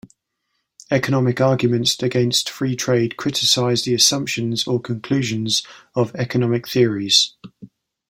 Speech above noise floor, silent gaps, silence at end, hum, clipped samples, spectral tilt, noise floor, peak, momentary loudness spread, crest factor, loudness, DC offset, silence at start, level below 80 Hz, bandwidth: 55 dB; none; 0.45 s; none; under 0.1%; -4 dB/octave; -74 dBFS; 0 dBFS; 8 LU; 20 dB; -18 LUFS; under 0.1%; 0.9 s; -58 dBFS; 16.5 kHz